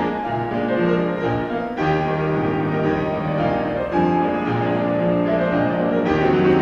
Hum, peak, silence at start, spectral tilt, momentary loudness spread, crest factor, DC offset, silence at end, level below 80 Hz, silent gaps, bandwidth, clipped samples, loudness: none; -6 dBFS; 0 s; -8.5 dB/octave; 4 LU; 14 dB; under 0.1%; 0 s; -44 dBFS; none; 6.8 kHz; under 0.1%; -20 LUFS